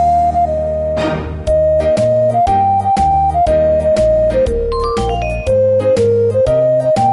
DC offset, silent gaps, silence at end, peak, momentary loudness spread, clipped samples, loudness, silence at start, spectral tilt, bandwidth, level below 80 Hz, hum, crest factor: under 0.1%; none; 0 s; -4 dBFS; 5 LU; under 0.1%; -13 LUFS; 0 s; -7 dB/octave; 11.5 kHz; -26 dBFS; none; 8 dB